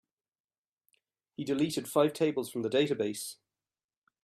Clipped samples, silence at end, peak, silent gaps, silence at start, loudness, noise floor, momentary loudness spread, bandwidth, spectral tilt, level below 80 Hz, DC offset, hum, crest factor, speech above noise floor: under 0.1%; 0.9 s; -14 dBFS; none; 1.4 s; -31 LUFS; under -90 dBFS; 12 LU; 15.5 kHz; -5 dB/octave; -76 dBFS; under 0.1%; none; 20 dB; over 60 dB